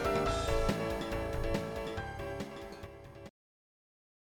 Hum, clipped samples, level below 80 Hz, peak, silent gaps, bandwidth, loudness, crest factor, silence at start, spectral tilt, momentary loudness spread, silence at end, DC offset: none; under 0.1%; -44 dBFS; -16 dBFS; none; 19 kHz; -36 LUFS; 20 dB; 0 s; -5.5 dB/octave; 18 LU; 0.9 s; under 0.1%